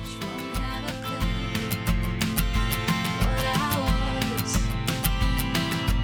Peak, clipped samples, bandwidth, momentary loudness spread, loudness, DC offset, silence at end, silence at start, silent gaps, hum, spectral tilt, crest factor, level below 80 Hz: -4 dBFS; under 0.1%; over 20 kHz; 6 LU; -26 LUFS; under 0.1%; 0 s; 0 s; none; none; -4.5 dB/octave; 22 dB; -30 dBFS